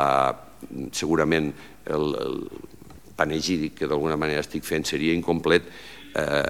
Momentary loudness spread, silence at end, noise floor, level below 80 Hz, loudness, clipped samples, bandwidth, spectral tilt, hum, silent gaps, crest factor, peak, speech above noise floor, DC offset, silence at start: 18 LU; 0 s; -46 dBFS; -50 dBFS; -25 LUFS; under 0.1%; 16.5 kHz; -4.5 dB/octave; none; none; 22 dB; -4 dBFS; 21 dB; 0.4%; 0 s